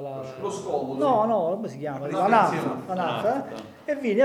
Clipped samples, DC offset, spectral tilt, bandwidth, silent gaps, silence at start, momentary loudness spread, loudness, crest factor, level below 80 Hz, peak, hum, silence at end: under 0.1%; under 0.1%; -6 dB/octave; 15 kHz; none; 0 s; 12 LU; -25 LUFS; 20 dB; -72 dBFS; -6 dBFS; none; 0 s